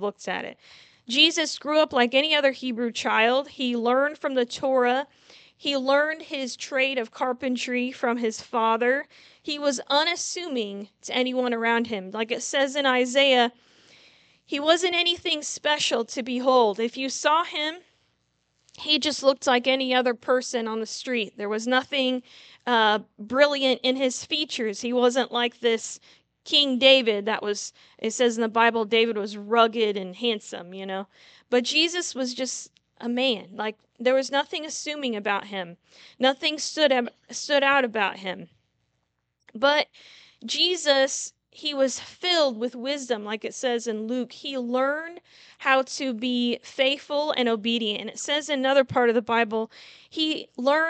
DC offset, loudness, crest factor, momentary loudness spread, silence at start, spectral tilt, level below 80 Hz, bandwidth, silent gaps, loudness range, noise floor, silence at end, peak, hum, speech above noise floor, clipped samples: under 0.1%; -24 LUFS; 22 dB; 11 LU; 0 s; -2 dB/octave; -74 dBFS; 9.2 kHz; none; 4 LU; -76 dBFS; 0 s; -2 dBFS; none; 51 dB; under 0.1%